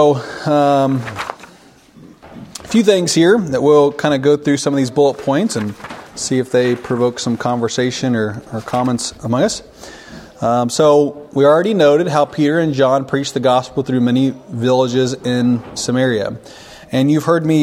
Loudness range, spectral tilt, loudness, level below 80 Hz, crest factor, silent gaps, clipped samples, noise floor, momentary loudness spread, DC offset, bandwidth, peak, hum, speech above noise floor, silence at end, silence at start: 4 LU; -5.5 dB/octave; -15 LUFS; -52 dBFS; 16 dB; none; under 0.1%; -45 dBFS; 12 LU; under 0.1%; 15.5 kHz; 0 dBFS; none; 30 dB; 0 s; 0 s